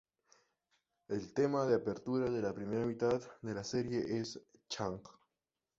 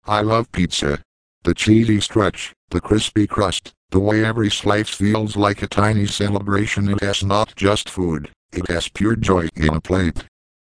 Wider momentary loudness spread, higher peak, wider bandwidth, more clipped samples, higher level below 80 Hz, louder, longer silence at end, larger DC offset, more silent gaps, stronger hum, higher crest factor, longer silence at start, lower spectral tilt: first, 10 LU vs 7 LU; second, -20 dBFS vs 0 dBFS; second, 7.8 kHz vs 10.5 kHz; neither; second, -68 dBFS vs -36 dBFS; second, -37 LUFS vs -19 LUFS; first, 0.7 s vs 0.4 s; neither; second, none vs 1.05-1.41 s, 2.56-2.68 s, 3.77-3.88 s, 8.36-8.49 s; neither; about the same, 18 dB vs 18 dB; first, 1.1 s vs 0.05 s; about the same, -6 dB/octave vs -5.5 dB/octave